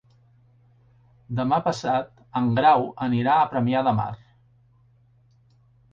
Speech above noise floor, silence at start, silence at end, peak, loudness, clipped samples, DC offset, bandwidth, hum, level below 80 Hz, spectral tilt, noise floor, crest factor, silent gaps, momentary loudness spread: 37 dB; 1.3 s; 1.75 s; -6 dBFS; -23 LUFS; under 0.1%; under 0.1%; 7.8 kHz; none; -60 dBFS; -7 dB/octave; -59 dBFS; 20 dB; none; 12 LU